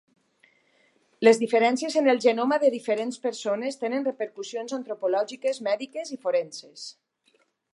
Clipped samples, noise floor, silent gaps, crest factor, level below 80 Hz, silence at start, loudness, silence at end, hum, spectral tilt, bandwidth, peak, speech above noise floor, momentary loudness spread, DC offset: under 0.1%; -67 dBFS; none; 22 dB; -84 dBFS; 1.2 s; -25 LUFS; 0.85 s; none; -3.5 dB/octave; 11.5 kHz; -4 dBFS; 42 dB; 14 LU; under 0.1%